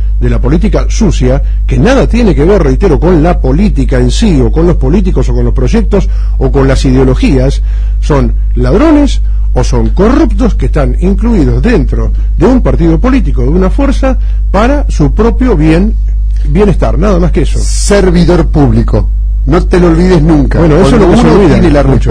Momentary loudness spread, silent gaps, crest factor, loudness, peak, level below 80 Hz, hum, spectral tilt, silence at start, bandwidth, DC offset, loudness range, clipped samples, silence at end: 6 LU; none; 6 dB; -8 LUFS; 0 dBFS; -10 dBFS; none; -7 dB/octave; 0 s; 10 kHz; under 0.1%; 2 LU; 0.5%; 0 s